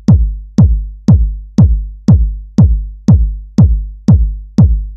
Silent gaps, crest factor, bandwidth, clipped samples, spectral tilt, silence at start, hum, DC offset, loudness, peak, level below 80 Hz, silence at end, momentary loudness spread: none; 10 dB; 7 kHz; 0.9%; -10 dB/octave; 0.1 s; none; 0.3%; -12 LUFS; 0 dBFS; -14 dBFS; 0 s; 5 LU